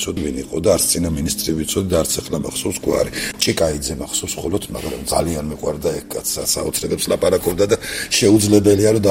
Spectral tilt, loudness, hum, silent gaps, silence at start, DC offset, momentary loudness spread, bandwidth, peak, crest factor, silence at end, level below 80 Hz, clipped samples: -4 dB/octave; -18 LUFS; none; none; 0 s; under 0.1%; 10 LU; 16.5 kHz; 0 dBFS; 18 dB; 0 s; -38 dBFS; under 0.1%